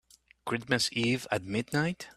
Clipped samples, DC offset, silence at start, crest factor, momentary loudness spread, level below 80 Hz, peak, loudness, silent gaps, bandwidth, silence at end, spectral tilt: under 0.1%; under 0.1%; 0.45 s; 22 dB; 8 LU; -62 dBFS; -10 dBFS; -30 LUFS; none; 14.5 kHz; 0.05 s; -4 dB/octave